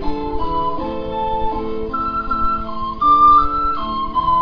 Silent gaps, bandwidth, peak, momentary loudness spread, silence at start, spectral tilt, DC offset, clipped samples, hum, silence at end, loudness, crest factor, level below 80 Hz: none; 5.4 kHz; -4 dBFS; 13 LU; 0 s; -8 dB/octave; under 0.1%; under 0.1%; none; 0 s; -18 LUFS; 14 dB; -30 dBFS